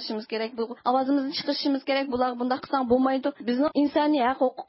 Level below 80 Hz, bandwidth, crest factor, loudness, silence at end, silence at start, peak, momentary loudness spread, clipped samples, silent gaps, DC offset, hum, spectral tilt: -62 dBFS; 5.8 kHz; 16 dB; -25 LUFS; 0.05 s; 0 s; -10 dBFS; 7 LU; under 0.1%; none; under 0.1%; none; -8 dB/octave